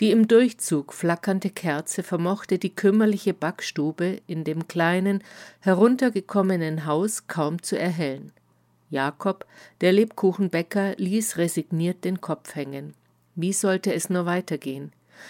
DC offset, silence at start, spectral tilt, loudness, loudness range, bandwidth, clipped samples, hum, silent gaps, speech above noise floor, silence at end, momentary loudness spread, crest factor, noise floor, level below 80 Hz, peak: under 0.1%; 0 s; -5.5 dB/octave; -24 LUFS; 4 LU; 17 kHz; under 0.1%; none; none; 40 dB; 0 s; 11 LU; 20 dB; -63 dBFS; -76 dBFS; -4 dBFS